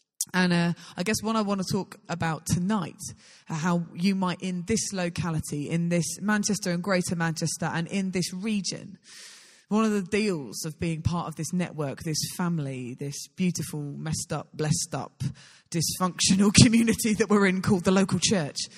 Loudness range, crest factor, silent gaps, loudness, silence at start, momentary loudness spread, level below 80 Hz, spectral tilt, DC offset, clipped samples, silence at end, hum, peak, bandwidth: 8 LU; 24 dB; none; -26 LUFS; 0.2 s; 12 LU; -54 dBFS; -4.5 dB/octave; under 0.1%; under 0.1%; 0 s; none; -2 dBFS; 15 kHz